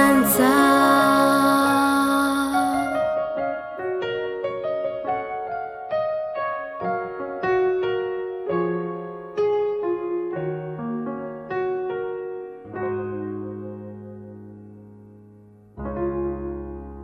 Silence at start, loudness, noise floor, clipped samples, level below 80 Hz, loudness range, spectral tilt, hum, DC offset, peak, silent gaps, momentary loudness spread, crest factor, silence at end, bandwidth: 0 s; -23 LUFS; -49 dBFS; under 0.1%; -50 dBFS; 14 LU; -4.5 dB/octave; none; under 0.1%; -4 dBFS; none; 17 LU; 20 dB; 0 s; 16.5 kHz